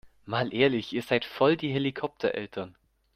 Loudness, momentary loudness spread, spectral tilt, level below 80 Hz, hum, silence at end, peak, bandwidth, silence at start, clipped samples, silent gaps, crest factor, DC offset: -28 LUFS; 11 LU; -6.5 dB/octave; -64 dBFS; none; 0.45 s; -8 dBFS; 15 kHz; 0.05 s; under 0.1%; none; 20 dB; under 0.1%